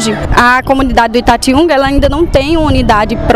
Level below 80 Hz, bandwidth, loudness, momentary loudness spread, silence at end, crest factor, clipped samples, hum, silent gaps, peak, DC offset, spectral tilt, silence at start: -18 dBFS; 15.5 kHz; -9 LUFS; 3 LU; 0 s; 8 dB; 0.6%; none; none; 0 dBFS; under 0.1%; -5 dB/octave; 0 s